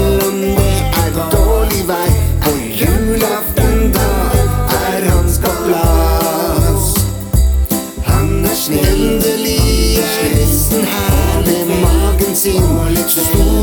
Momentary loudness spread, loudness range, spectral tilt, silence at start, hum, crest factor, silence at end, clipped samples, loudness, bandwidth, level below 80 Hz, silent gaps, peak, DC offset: 3 LU; 1 LU; -5 dB/octave; 0 s; none; 12 dB; 0 s; under 0.1%; -13 LUFS; over 20 kHz; -16 dBFS; none; 0 dBFS; under 0.1%